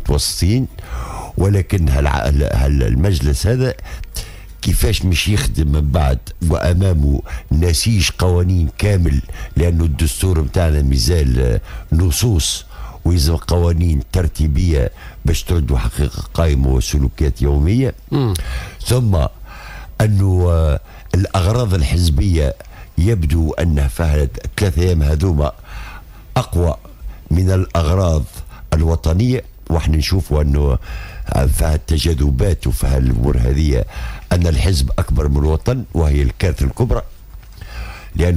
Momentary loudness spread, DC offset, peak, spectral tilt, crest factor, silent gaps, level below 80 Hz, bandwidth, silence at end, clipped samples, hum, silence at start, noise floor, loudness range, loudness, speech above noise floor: 10 LU; under 0.1%; -4 dBFS; -6 dB/octave; 12 dB; none; -20 dBFS; 16 kHz; 0 s; under 0.1%; none; 0 s; -35 dBFS; 2 LU; -17 LUFS; 20 dB